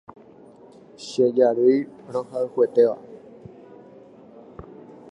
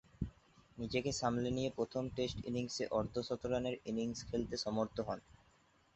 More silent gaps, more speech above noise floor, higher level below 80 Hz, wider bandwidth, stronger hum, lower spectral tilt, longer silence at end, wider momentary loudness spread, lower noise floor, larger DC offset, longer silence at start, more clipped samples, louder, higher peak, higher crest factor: neither; second, 28 dB vs 32 dB; about the same, -62 dBFS vs -58 dBFS; first, 9.8 kHz vs 8.2 kHz; neither; first, -6.5 dB/octave vs -5 dB/octave; second, 0.4 s vs 0.6 s; first, 26 LU vs 10 LU; second, -48 dBFS vs -71 dBFS; neither; first, 1 s vs 0.2 s; neither; first, -21 LUFS vs -40 LUFS; first, -6 dBFS vs -20 dBFS; about the same, 18 dB vs 20 dB